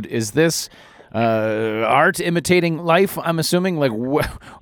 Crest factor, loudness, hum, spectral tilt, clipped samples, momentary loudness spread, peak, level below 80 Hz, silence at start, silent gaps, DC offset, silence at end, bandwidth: 18 dB; -18 LUFS; none; -5 dB/octave; under 0.1%; 6 LU; -2 dBFS; -46 dBFS; 0 s; none; under 0.1%; 0.05 s; over 20 kHz